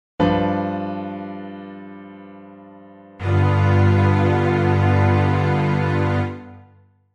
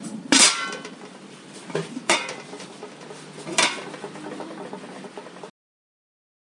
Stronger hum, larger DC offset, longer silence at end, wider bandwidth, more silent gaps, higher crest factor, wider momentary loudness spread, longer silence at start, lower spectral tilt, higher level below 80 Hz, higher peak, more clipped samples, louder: neither; neither; second, 0.55 s vs 1 s; second, 6.4 kHz vs 11.5 kHz; neither; second, 14 dB vs 26 dB; second, 20 LU vs 26 LU; first, 0.2 s vs 0 s; first, -8.5 dB/octave vs -1 dB/octave; first, -50 dBFS vs -72 dBFS; second, -6 dBFS vs -2 dBFS; neither; about the same, -19 LUFS vs -20 LUFS